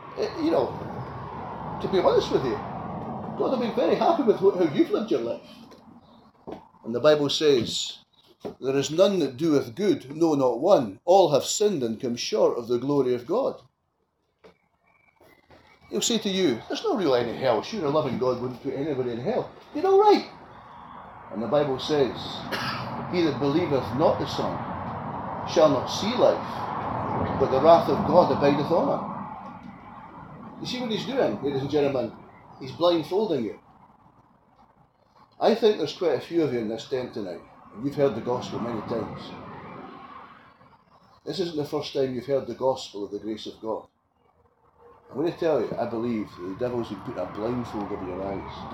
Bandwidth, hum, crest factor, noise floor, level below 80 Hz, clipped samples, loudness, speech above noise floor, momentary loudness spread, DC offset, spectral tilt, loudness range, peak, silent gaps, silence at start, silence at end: 16 kHz; none; 22 dB; -73 dBFS; -58 dBFS; under 0.1%; -25 LUFS; 49 dB; 18 LU; under 0.1%; -5.5 dB/octave; 8 LU; -4 dBFS; none; 0 s; 0 s